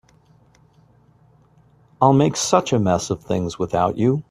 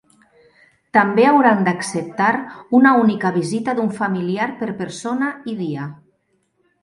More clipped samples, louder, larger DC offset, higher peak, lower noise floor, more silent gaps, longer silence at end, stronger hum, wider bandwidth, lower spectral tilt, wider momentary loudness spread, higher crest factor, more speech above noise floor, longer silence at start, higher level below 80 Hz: neither; about the same, -19 LUFS vs -18 LUFS; neither; about the same, 0 dBFS vs 0 dBFS; second, -55 dBFS vs -66 dBFS; neither; second, 0.1 s vs 0.9 s; neither; first, 13.5 kHz vs 11.5 kHz; about the same, -5.5 dB/octave vs -6 dB/octave; second, 8 LU vs 13 LU; about the same, 20 dB vs 18 dB; second, 36 dB vs 48 dB; first, 2 s vs 0.95 s; first, -52 dBFS vs -64 dBFS